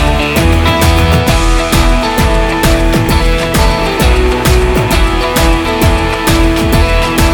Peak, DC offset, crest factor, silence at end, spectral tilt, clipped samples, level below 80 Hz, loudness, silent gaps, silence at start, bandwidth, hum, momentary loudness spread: 0 dBFS; under 0.1%; 8 dB; 0 s; -5 dB/octave; 0.2%; -12 dBFS; -10 LUFS; none; 0 s; over 20 kHz; none; 2 LU